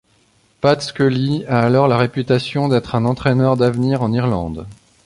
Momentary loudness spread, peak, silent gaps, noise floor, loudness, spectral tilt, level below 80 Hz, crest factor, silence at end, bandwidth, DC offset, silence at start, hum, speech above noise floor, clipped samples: 5 LU; -2 dBFS; none; -57 dBFS; -17 LUFS; -7.5 dB/octave; -44 dBFS; 16 dB; 0.3 s; 11 kHz; under 0.1%; 0.65 s; none; 41 dB; under 0.1%